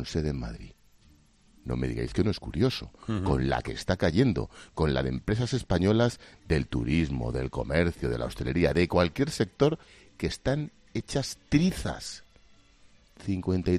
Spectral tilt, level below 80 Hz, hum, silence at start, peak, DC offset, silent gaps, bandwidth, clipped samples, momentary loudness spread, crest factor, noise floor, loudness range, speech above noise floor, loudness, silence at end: -6.5 dB/octave; -42 dBFS; none; 0 s; -8 dBFS; under 0.1%; none; 14 kHz; under 0.1%; 11 LU; 20 dB; -59 dBFS; 4 LU; 32 dB; -29 LUFS; 0 s